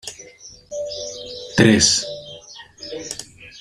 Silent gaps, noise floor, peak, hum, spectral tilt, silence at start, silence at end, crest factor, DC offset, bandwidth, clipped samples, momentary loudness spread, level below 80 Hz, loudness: none; -44 dBFS; 0 dBFS; none; -3 dB/octave; 0.05 s; 0 s; 22 dB; under 0.1%; 15 kHz; under 0.1%; 25 LU; -50 dBFS; -18 LUFS